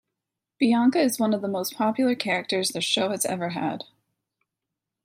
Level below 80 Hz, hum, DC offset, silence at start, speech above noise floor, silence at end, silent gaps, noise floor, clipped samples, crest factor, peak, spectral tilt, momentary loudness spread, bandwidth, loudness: -76 dBFS; none; under 0.1%; 0.6 s; 62 dB; 1.2 s; none; -86 dBFS; under 0.1%; 18 dB; -8 dBFS; -3.5 dB/octave; 9 LU; 16 kHz; -24 LUFS